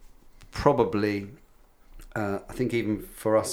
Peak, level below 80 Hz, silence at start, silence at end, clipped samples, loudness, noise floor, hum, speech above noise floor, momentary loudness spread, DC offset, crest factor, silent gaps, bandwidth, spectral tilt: -6 dBFS; -48 dBFS; 0 s; 0 s; under 0.1%; -27 LUFS; -55 dBFS; none; 29 dB; 13 LU; under 0.1%; 22 dB; none; over 20 kHz; -6 dB/octave